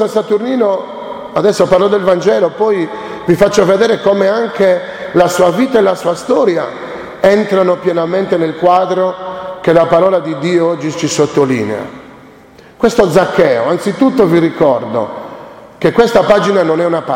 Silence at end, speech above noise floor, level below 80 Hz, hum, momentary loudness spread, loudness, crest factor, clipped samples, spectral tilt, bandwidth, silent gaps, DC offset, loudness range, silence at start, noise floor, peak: 0 s; 28 dB; -46 dBFS; none; 10 LU; -12 LUFS; 12 dB; under 0.1%; -5.5 dB/octave; 16.5 kHz; none; under 0.1%; 2 LU; 0 s; -39 dBFS; 0 dBFS